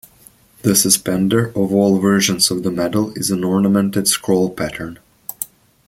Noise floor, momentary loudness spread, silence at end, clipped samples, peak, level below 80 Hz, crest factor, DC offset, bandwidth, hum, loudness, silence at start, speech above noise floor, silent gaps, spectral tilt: -49 dBFS; 15 LU; 0.4 s; under 0.1%; 0 dBFS; -50 dBFS; 18 dB; under 0.1%; 16.5 kHz; none; -16 LUFS; 0.65 s; 32 dB; none; -4 dB/octave